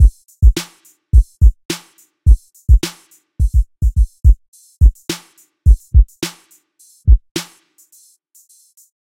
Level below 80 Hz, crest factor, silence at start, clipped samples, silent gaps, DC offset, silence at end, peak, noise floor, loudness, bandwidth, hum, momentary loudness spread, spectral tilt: -14 dBFS; 14 dB; 0 s; 0.2%; 1.65-1.69 s, 4.48-4.53 s, 7.31-7.35 s; under 0.1%; 1.6 s; 0 dBFS; -51 dBFS; -17 LUFS; 14.5 kHz; none; 12 LU; -5.5 dB/octave